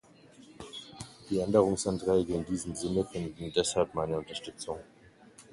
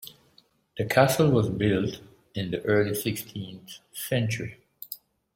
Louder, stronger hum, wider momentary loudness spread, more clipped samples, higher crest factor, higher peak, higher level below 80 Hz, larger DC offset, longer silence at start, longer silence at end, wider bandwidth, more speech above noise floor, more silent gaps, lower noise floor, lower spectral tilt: second, -31 LUFS vs -26 LUFS; neither; second, 18 LU vs 21 LU; neither; about the same, 22 dB vs 22 dB; second, -10 dBFS vs -6 dBFS; about the same, -56 dBFS vs -56 dBFS; neither; first, 0.4 s vs 0 s; second, 0.1 s vs 0.4 s; second, 11.5 kHz vs 16.5 kHz; second, 26 dB vs 37 dB; neither; second, -56 dBFS vs -63 dBFS; about the same, -5 dB/octave vs -5.5 dB/octave